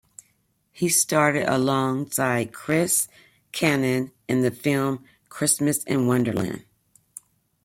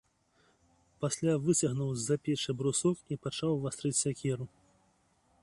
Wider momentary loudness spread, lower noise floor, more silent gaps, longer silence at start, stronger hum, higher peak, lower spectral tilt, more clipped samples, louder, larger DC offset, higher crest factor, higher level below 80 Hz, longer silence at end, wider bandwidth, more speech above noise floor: first, 11 LU vs 8 LU; about the same, -68 dBFS vs -70 dBFS; neither; second, 0.75 s vs 1 s; neither; first, -6 dBFS vs -16 dBFS; about the same, -4 dB/octave vs -5 dB/octave; neither; first, -23 LUFS vs -32 LUFS; neither; about the same, 18 dB vs 18 dB; about the same, -62 dBFS vs -66 dBFS; about the same, 1.05 s vs 0.95 s; first, 16.5 kHz vs 11.5 kHz; first, 45 dB vs 39 dB